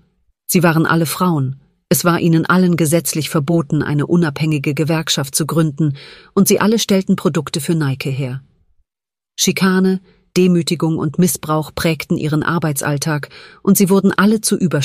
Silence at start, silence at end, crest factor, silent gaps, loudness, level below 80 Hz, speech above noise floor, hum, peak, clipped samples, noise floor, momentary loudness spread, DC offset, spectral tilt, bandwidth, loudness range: 0.5 s; 0 s; 14 dB; none; -16 LUFS; -50 dBFS; over 75 dB; none; 0 dBFS; under 0.1%; under -90 dBFS; 8 LU; under 0.1%; -5 dB/octave; 15.5 kHz; 3 LU